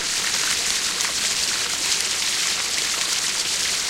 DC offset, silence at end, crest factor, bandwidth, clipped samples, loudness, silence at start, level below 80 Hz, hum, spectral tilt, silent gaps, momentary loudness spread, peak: under 0.1%; 0 s; 22 dB; 16.5 kHz; under 0.1%; -20 LUFS; 0 s; -54 dBFS; none; 1.5 dB/octave; none; 1 LU; 0 dBFS